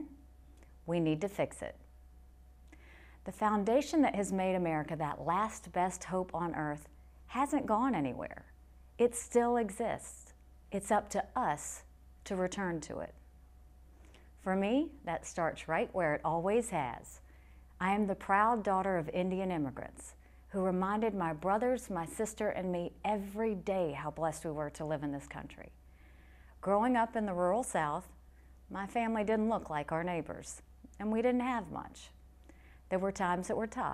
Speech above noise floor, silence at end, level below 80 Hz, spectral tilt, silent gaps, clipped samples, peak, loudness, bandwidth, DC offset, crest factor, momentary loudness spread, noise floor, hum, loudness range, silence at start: 24 dB; 0 s; -58 dBFS; -5.5 dB/octave; none; under 0.1%; -16 dBFS; -34 LUFS; 14.5 kHz; under 0.1%; 20 dB; 15 LU; -58 dBFS; none; 4 LU; 0 s